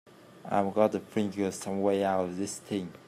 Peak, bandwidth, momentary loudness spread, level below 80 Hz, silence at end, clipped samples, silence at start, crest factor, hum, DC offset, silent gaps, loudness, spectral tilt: -12 dBFS; 15 kHz; 8 LU; -74 dBFS; 0.1 s; under 0.1%; 0.3 s; 20 dB; none; under 0.1%; none; -30 LUFS; -5.5 dB/octave